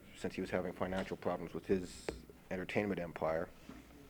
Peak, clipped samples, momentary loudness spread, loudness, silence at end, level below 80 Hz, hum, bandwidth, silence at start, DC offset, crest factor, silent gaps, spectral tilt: -18 dBFS; under 0.1%; 10 LU; -40 LUFS; 0 s; -60 dBFS; none; over 20 kHz; 0 s; under 0.1%; 22 dB; none; -6 dB/octave